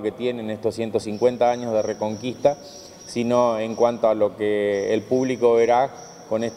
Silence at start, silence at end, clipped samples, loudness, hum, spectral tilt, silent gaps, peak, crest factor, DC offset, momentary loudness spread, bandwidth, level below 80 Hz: 0 s; 0 s; under 0.1%; -22 LUFS; none; -5.5 dB/octave; none; -4 dBFS; 16 dB; under 0.1%; 8 LU; 12.5 kHz; -62 dBFS